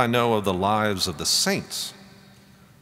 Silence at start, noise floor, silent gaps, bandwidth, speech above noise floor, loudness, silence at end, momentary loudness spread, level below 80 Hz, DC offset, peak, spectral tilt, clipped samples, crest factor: 0 s; -52 dBFS; none; 16 kHz; 29 dB; -23 LUFS; 0.7 s; 10 LU; -60 dBFS; under 0.1%; -4 dBFS; -3 dB/octave; under 0.1%; 20 dB